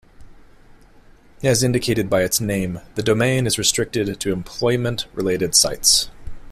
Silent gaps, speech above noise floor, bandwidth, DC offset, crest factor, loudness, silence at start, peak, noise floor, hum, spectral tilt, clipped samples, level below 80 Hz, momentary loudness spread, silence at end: none; 28 dB; 16 kHz; under 0.1%; 20 dB; -19 LUFS; 0.2 s; 0 dBFS; -48 dBFS; none; -3.5 dB/octave; under 0.1%; -42 dBFS; 10 LU; 0 s